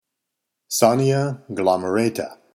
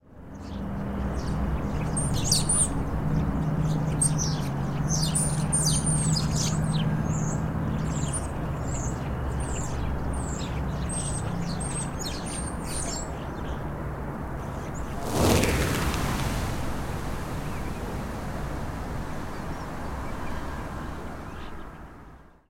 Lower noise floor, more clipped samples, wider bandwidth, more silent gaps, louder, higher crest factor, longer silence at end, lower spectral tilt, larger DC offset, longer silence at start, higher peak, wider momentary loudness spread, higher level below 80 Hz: first, -81 dBFS vs -49 dBFS; neither; about the same, 16.5 kHz vs 16.5 kHz; neither; first, -20 LUFS vs -28 LUFS; about the same, 22 dB vs 22 dB; about the same, 0.2 s vs 0.3 s; about the same, -5 dB/octave vs -4.5 dB/octave; neither; first, 0.7 s vs 0.05 s; first, 0 dBFS vs -6 dBFS; second, 9 LU vs 12 LU; second, -68 dBFS vs -36 dBFS